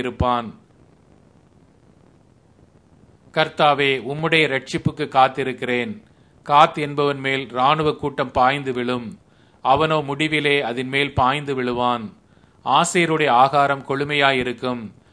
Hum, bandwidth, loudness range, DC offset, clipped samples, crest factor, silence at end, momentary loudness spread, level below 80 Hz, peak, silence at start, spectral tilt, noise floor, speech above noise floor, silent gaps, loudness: none; 11 kHz; 5 LU; under 0.1%; under 0.1%; 20 dB; 0.2 s; 11 LU; -48 dBFS; 0 dBFS; 0 s; -4.5 dB/octave; -54 dBFS; 34 dB; none; -19 LUFS